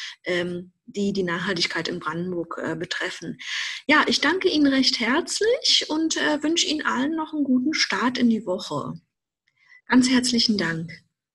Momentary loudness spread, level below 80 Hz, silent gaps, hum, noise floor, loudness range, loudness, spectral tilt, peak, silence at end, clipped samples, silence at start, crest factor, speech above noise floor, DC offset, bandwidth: 11 LU; -62 dBFS; none; none; -75 dBFS; 6 LU; -22 LUFS; -3 dB/octave; -6 dBFS; 0.35 s; under 0.1%; 0 s; 18 dB; 52 dB; under 0.1%; 12 kHz